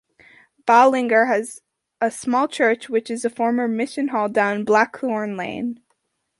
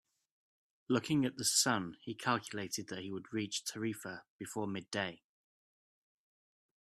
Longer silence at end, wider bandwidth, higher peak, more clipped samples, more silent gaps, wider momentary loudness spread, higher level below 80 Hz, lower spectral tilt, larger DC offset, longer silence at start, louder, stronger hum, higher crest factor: second, 0.65 s vs 1.65 s; second, 11.5 kHz vs 15 kHz; first, -2 dBFS vs -16 dBFS; neither; second, none vs 4.30-4.39 s; about the same, 12 LU vs 14 LU; first, -68 dBFS vs -76 dBFS; first, -4.5 dB/octave vs -3 dB/octave; neither; second, 0.65 s vs 0.9 s; first, -20 LUFS vs -36 LUFS; neither; about the same, 18 dB vs 22 dB